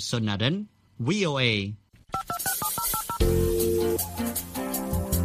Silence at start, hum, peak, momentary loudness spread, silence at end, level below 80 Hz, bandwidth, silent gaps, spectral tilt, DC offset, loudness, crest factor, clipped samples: 0 s; none; -8 dBFS; 10 LU; 0 s; -38 dBFS; 15.5 kHz; none; -4.5 dB/octave; under 0.1%; -27 LUFS; 18 dB; under 0.1%